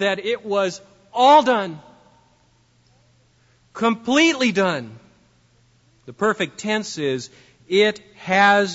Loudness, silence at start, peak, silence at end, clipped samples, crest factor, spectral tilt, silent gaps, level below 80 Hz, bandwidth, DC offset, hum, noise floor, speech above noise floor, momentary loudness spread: -19 LUFS; 0 s; -4 dBFS; 0 s; under 0.1%; 18 dB; -4 dB/octave; none; -66 dBFS; 8 kHz; under 0.1%; none; -59 dBFS; 40 dB; 18 LU